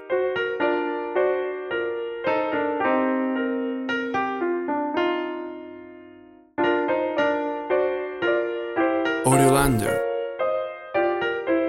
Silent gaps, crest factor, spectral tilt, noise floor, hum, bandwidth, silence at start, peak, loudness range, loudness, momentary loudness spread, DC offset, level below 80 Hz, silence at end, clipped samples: none; 20 dB; -5.5 dB/octave; -48 dBFS; none; 16.5 kHz; 0 s; -4 dBFS; 4 LU; -24 LUFS; 7 LU; under 0.1%; -48 dBFS; 0 s; under 0.1%